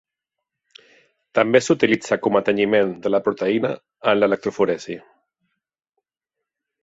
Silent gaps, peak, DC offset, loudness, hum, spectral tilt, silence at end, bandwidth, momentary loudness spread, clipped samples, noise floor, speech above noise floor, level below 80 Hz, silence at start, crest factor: none; -2 dBFS; under 0.1%; -20 LUFS; none; -5 dB/octave; 1.85 s; 8 kHz; 8 LU; under 0.1%; -84 dBFS; 65 dB; -64 dBFS; 1.35 s; 20 dB